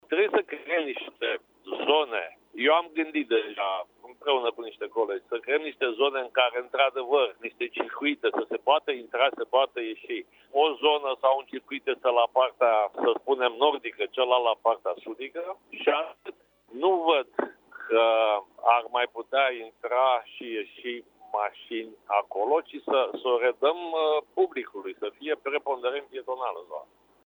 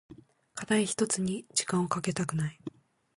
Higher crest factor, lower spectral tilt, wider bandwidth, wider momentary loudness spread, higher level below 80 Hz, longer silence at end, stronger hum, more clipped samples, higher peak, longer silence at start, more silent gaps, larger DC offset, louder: about the same, 20 dB vs 20 dB; about the same, -4.5 dB/octave vs -4 dB/octave; first, over 20 kHz vs 11.5 kHz; second, 13 LU vs 16 LU; second, -80 dBFS vs -64 dBFS; about the same, 0.4 s vs 0.45 s; neither; neither; first, -6 dBFS vs -14 dBFS; about the same, 0.1 s vs 0.1 s; neither; neither; first, -27 LUFS vs -30 LUFS